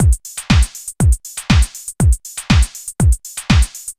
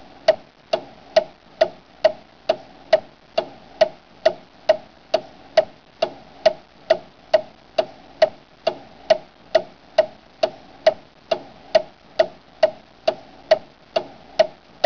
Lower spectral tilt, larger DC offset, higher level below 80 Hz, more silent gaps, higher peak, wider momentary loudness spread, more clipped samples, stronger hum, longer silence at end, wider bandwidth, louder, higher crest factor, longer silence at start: about the same, -4.5 dB/octave vs -3.5 dB/octave; about the same, 0.1% vs 0.2%; first, -18 dBFS vs -60 dBFS; neither; first, 0 dBFS vs -6 dBFS; about the same, 6 LU vs 6 LU; neither; neither; second, 0.05 s vs 0.35 s; first, 16 kHz vs 5.4 kHz; first, -17 LUFS vs -23 LUFS; about the same, 14 dB vs 18 dB; second, 0 s vs 0.3 s